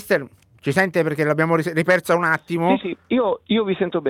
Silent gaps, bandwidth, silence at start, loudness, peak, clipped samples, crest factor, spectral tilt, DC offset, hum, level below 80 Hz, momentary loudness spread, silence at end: none; 16.5 kHz; 0 s; -20 LUFS; -4 dBFS; under 0.1%; 16 dB; -6 dB/octave; under 0.1%; none; -60 dBFS; 5 LU; 0 s